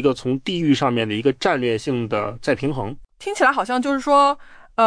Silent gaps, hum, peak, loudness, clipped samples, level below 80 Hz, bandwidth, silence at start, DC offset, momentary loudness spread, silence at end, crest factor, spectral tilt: none; none; -4 dBFS; -20 LUFS; under 0.1%; -50 dBFS; 10.5 kHz; 0 s; under 0.1%; 13 LU; 0 s; 16 dB; -5.5 dB/octave